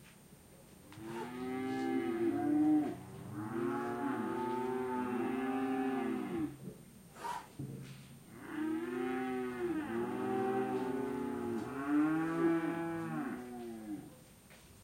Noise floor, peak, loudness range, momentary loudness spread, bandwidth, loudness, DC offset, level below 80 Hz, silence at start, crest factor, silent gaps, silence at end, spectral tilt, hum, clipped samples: -59 dBFS; -22 dBFS; 5 LU; 18 LU; 16 kHz; -37 LUFS; under 0.1%; -70 dBFS; 0 s; 16 dB; none; 0 s; -6.5 dB/octave; none; under 0.1%